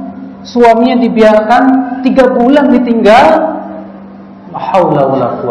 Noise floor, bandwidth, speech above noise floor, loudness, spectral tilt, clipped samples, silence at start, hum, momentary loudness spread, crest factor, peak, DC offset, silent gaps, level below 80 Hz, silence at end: -30 dBFS; 11 kHz; 23 dB; -8 LUFS; -6.5 dB/octave; 5%; 0 s; none; 19 LU; 8 dB; 0 dBFS; under 0.1%; none; -42 dBFS; 0 s